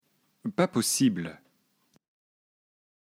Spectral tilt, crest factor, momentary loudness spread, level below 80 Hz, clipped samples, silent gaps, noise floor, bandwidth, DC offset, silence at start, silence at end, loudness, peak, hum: -4 dB/octave; 22 dB; 15 LU; -74 dBFS; under 0.1%; none; -70 dBFS; 16 kHz; under 0.1%; 0.45 s; 1.7 s; -27 LUFS; -10 dBFS; none